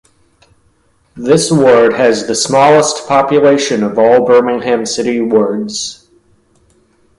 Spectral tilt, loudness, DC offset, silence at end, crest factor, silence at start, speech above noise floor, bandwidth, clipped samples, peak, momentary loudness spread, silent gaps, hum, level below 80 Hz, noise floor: -4 dB/octave; -11 LUFS; under 0.1%; 1.25 s; 12 dB; 1.15 s; 44 dB; 11.5 kHz; under 0.1%; 0 dBFS; 8 LU; none; none; -52 dBFS; -54 dBFS